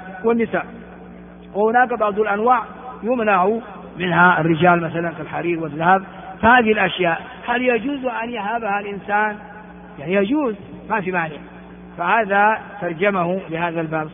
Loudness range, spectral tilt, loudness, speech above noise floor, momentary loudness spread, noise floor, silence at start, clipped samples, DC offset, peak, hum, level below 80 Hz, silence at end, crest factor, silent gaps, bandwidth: 5 LU; -4 dB/octave; -19 LUFS; 20 dB; 20 LU; -39 dBFS; 0 s; under 0.1%; under 0.1%; 0 dBFS; none; -52 dBFS; 0 s; 20 dB; none; 3.7 kHz